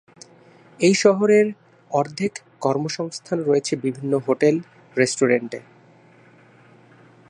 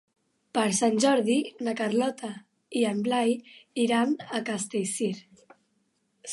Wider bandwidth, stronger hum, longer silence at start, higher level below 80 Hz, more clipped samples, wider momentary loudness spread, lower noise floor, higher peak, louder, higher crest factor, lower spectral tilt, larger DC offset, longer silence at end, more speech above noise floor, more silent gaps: about the same, 11 kHz vs 11.5 kHz; neither; first, 0.8 s vs 0.55 s; first, -72 dBFS vs -78 dBFS; neither; second, 11 LU vs 14 LU; second, -51 dBFS vs -73 dBFS; first, -2 dBFS vs -10 dBFS; first, -21 LUFS vs -27 LUFS; about the same, 20 dB vs 18 dB; about the same, -5 dB/octave vs -4 dB/octave; neither; first, 1.7 s vs 0 s; second, 31 dB vs 46 dB; neither